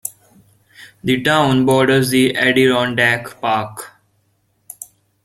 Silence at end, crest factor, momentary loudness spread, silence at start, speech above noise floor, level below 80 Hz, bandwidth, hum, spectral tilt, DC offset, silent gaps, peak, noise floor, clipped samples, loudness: 0.4 s; 16 dB; 21 LU; 0.05 s; 48 dB; -52 dBFS; 15.5 kHz; none; -4.5 dB/octave; under 0.1%; none; 0 dBFS; -63 dBFS; under 0.1%; -15 LUFS